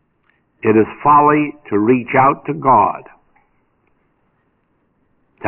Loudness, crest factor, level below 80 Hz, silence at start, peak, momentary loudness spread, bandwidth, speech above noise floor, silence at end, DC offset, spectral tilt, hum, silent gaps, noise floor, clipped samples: -14 LUFS; 14 dB; -54 dBFS; 0.65 s; -2 dBFS; 8 LU; 3.1 kHz; 49 dB; 0 s; under 0.1%; -7 dB/octave; none; none; -63 dBFS; under 0.1%